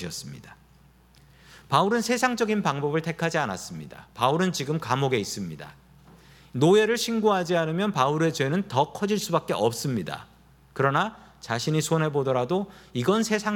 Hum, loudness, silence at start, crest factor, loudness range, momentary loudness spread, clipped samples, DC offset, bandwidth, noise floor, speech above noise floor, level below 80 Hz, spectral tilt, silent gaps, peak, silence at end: none; -25 LUFS; 0 s; 20 dB; 3 LU; 14 LU; under 0.1%; under 0.1%; 17.5 kHz; -56 dBFS; 31 dB; -60 dBFS; -5 dB/octave; none; -6 dBFS; 0 s